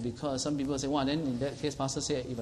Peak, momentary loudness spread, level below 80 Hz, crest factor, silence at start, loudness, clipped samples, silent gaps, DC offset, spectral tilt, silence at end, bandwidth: -16 dBFS; 4 LU; -54 dBFS; 16 dB; 0 s; -32 LUFS; under 0.1%; none; under 0.1%; -5 dB/octave; 0 s; 12.5 kHz